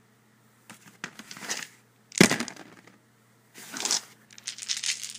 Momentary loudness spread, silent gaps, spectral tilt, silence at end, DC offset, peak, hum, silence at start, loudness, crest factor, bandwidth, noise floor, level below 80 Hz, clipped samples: 26 LU; none; -2.5 dB/octave; 0 s; under 0.1%; 0 dBFS; none; 0.7 s; -27 LUFS; 32 dB; 15.5 kHz; -61 dBFS; -70 dBFS; under 0.1%